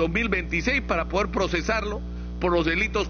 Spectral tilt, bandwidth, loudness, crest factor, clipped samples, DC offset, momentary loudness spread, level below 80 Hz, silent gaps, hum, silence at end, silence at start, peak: -4 dB/octave; 7 kHz; -25 LUFS; 14 dB; under 0.1%; under 0.1%; 7 LU; -34 dBFS; none; 60 Hz at -35 dBFS; 0 s; 0 s; -10 dBFS